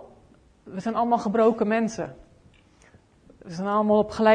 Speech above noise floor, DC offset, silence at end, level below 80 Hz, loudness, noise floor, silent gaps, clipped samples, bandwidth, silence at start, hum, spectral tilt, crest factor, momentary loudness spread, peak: 34 dB; under 0.1%; 0 s; -58 dBFS; -24 LUFS; -56 dBFS; none; under 0.1%; 9.8 kHz; 0 s; none; -6.5 dB/octave; 18 dB; 15 LU; -8 dBFS